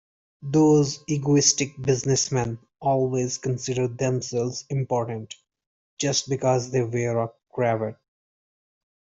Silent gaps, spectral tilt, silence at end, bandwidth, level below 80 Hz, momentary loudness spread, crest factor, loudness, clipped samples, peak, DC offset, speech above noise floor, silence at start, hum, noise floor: 5.67-5.97 s; -4.5 dB/octave; 1.2 s; 8 kHz; -60 dBFS; 12 LU; 20 dB; -24 LUFS; under 0.1%; -6 dBFS; under 0.1%; over 67 dB; 0.4 s; none; under -90 dBFS